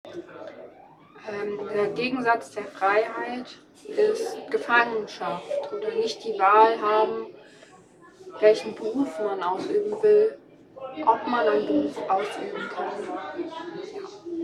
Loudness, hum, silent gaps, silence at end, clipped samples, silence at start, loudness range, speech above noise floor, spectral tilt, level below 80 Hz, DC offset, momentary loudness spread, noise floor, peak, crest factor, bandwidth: -25 LUFS; none; none; 0 s; under 0.1%; 0.05 s; 4 LU; 27 dB; -4.5 dB/octave; -72 dBFS; under 0.1%; 19 LU; -52 dBFS; -4 dBFS; 20 dB; 11.5 kHz